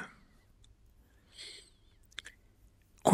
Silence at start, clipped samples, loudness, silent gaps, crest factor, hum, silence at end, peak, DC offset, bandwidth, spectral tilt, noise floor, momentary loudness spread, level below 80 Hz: 0 s; under 0.1%; -43 LUFS; none; 28 dB; none; 0 s; -8 dBFS; under 0.1%; 16 kHz; -4.5 dB/octave; -64 dBFS; 18 LU; -66 dBFS